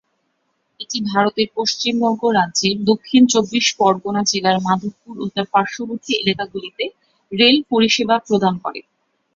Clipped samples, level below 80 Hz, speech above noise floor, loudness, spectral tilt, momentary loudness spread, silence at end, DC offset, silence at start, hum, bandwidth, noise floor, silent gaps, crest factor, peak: under 0.1%; -60 dBFS; 51 dB; -17 LUFS; -3.5 dB/octave; 13 LU; 0.55 s; under 0.1%; 0.8 s; none; 7.8 kHz; -69 dBFS; none; 16 dB; -2 dBFS